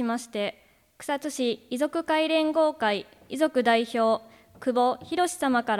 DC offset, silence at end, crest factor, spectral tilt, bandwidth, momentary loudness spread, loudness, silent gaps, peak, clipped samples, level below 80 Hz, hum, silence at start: under 0.1%; 0 s; 16 dB; -3.5 dB/octave; 16 kHz; 9 LU; -26 LUFS; none; -10 dBFS; under 0.1%; -68 dBFS; none; 0 s